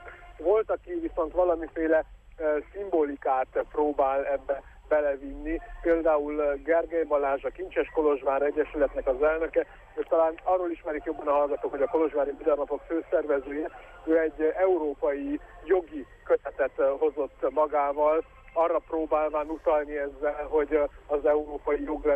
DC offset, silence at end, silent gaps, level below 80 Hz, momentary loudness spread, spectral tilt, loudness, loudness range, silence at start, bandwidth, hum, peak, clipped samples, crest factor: under 0.1%; 0 s; none; -50 dBFS; 8 LU; -8 dB/octave; -27 LUFS; 1 LU; 0 s; 3.6 kHz; none; -12 dBFS; under 0.1%; 14 dB